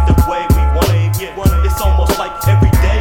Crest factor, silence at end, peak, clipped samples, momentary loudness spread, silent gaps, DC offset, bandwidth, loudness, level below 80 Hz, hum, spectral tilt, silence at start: 12 dB; 0 s; 0 dBFS; under 0.1%; 5 LU; none; 0.7%; 18 kHz; -14 LUFS; -14 dBFS; none; -6 dB/octave; 0 s